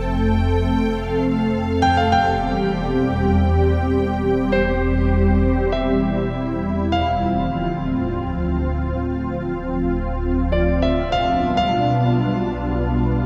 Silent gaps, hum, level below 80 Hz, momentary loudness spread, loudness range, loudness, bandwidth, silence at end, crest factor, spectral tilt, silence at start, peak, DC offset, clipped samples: none; none; -26 dBFS; 6 LU; 4 LU; -20 LUFS; 7.4 kHz; 0 s; 14 dB; -8 dB/octave; 0 s; -4 dBFS; under 0.1%; under 0.1%